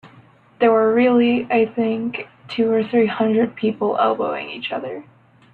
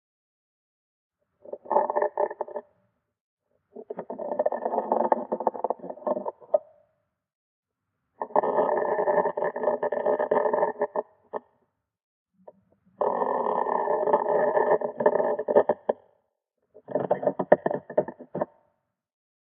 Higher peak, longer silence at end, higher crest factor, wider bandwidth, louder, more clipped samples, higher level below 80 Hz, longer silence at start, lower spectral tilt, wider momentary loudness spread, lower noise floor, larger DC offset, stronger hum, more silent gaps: about the same, -4 dBFS vs -2 dBFS; second, 0.5 s vs 1.05 s; second, 16 dB vs 26 dB; first, 4.6 kHz vs 3.5 kHz; first, -19 LUFS vs -27 LUFS; neither; first, -62 dBFS vs -80 dBFS; second, 0.05 s vs 1.5 s; first, -8.5 dB/octave vs -6 dB/octave; about the same, 13 LU vs 13 LU; second, -49 dBFS vs -81 dBFS; neither; neither; second, none vs 3.21-3.37 s, 7.35-7.63 s, 12.03-12.26 s